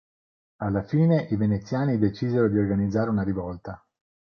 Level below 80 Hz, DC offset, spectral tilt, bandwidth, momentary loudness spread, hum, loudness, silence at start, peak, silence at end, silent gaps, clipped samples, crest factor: -48 dBFS; under 0.1%; -9.5 dB/octave; 6.6 kHz; 13 LU; none; -24 LUFS; 0.6 s; -10 dBFS; 0.6 s; none; under 0.1%; 16 dB